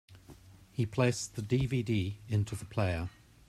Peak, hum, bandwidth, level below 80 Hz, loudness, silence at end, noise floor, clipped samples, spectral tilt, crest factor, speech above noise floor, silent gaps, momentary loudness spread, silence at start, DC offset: -14 dBFS; none; 13.5 kHz; -56 dBFS; -33 LUFS; 0.4 s; -55 dBFS; under 0.1%; -6 dB/octave; 20 dB; 23 dB; none; 7 LU; 0.1 s; under 0.1%